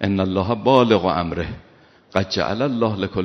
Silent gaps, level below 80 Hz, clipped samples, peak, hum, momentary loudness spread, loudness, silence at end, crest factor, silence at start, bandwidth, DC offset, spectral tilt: none; -46 dBFS; under 0.1%; 0 dBFS; none; 11 LU; -20 LUFS; 0 s; 20 dB; 0 s; 6.4 kHz; under 0.1%; -5 dB/octave